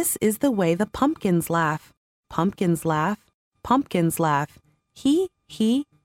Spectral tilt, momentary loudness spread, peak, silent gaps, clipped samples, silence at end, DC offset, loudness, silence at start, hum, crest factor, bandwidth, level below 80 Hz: -5.5 dB/octave; 9 LU; -6 dBFS; 1.97-2.23 s, 3.34-3.51 s; under 0.1%; 0.2 s; under 0.1%; -23 LUFS; 0 s; none; 18 dB; 17 kHz; -54 dBFS